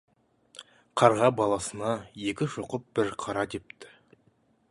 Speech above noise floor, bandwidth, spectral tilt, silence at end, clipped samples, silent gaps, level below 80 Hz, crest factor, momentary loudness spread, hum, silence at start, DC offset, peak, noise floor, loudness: 39 dB; 11.5 kHz; -5 dB/octave; 0.85 s; under 0.1%; none; -62 dBFS; 26 dB; 26 LU; none; 0.6 s; under 0.1%; -4 dBFS; -67 dBFS; -28 LUFS